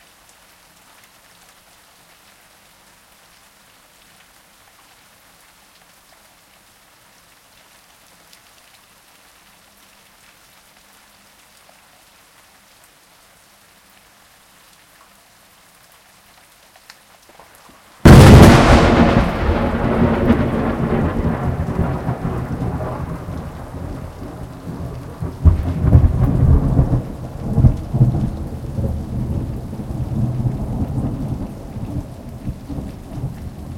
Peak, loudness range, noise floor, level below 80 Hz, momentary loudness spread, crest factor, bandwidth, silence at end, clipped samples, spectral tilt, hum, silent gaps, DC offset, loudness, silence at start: 0 dBFS; 14 LU; -50 dBFS; -26 dBFS; 19 LU; 18 dB; 16.5 kHz; 0 s; 0.2%; -7 dB/octave; none; none; under 0.1%; -16 LUFS; 18.05 s